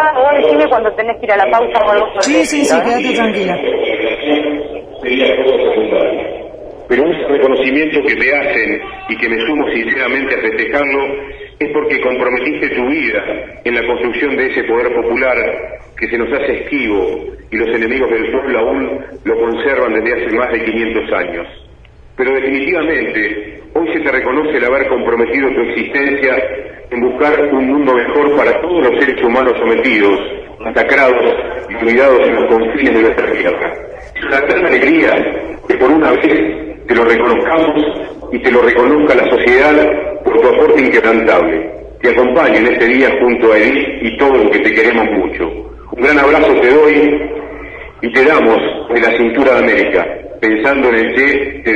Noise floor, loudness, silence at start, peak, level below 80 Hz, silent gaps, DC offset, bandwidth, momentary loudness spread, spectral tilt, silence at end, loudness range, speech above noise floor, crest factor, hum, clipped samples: -39 dBFS; -12 LUFS; 0 s; 0 dBFS; -38 dBFS; none; under 0.1%; 11 kHz; 11 LU; -5 dB/octave; 0 s; 5 LU; 27 dB; 12 dB; none; under 0.1%